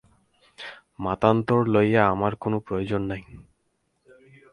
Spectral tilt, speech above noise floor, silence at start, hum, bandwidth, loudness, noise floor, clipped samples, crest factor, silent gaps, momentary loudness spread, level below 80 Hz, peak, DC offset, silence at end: -8.5 dB/octave; 49 dB; 0.6 s; none; 10.5 kHz; -23 LUFS; -72 dBFS; under 0.1%; 22 dB; none; 20 LU; -52 dBFS; -4 dBFS; under 0.1%; 1.1 s